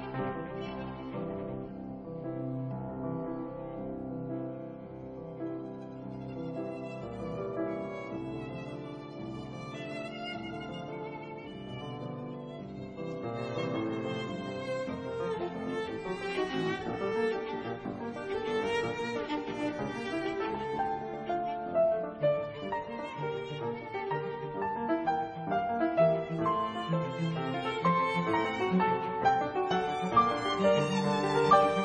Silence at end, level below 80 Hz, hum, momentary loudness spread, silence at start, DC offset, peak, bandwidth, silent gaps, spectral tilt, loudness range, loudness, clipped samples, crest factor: 0 s; -60 dBFS; none; 13 LU; 0 s; under 0.1%; -10 dBFS; 10 kHz; none; -6.5 dB/octave; 11 LU; -33 LUFS; under 0.1%; 22 dB